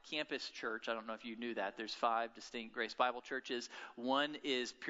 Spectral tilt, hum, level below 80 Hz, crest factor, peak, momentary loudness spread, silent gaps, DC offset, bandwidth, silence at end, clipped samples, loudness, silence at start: 0 dB/octave; none; -82 dBFS; 22 dB; -18 dBFS; 8 LU; none; under 0.1%; 7.6 kHz; 0 s; under 0.1%; -40 LUFS; 0.05 s